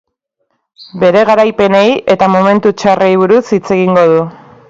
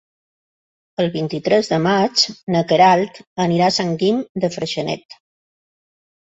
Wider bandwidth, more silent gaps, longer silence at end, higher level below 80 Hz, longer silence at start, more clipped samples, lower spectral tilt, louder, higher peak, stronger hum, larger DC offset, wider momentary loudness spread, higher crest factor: about the same, 7.8 kHz vs 8.2 kHz; second, none vs 2.43-2.47 s, 3.27-3.36 s, 4.29-4.35 s, 5.05-5.09 s; second, 0.4 s vs 1.05 s; first, -50 dBFS vs -60 dBFS; second, 0.8 s vs 1 s; first, 0.1% vs under 0.1%; first, -6.5 dB/octave vs -5 dB/octave; first, -9 LUFS vs -18 LUFS; about the same, 0 dBFS vs -2 dBFS; neither; neither; second, 5 LU vs 10 LU; second, 10 dB vs 18 dB